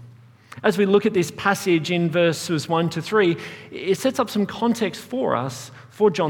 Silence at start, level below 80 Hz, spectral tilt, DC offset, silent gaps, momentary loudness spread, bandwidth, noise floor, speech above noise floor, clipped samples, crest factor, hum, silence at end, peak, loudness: 0 s; -64 dBFS; -5.5 dB/octave; under 0.1%; none; 9 LU; 18.5 kHz; -47 dBFS; 25 dB; under 0.1%; 18 dB; none; 0 s; -4 dBFS; -22 LUFS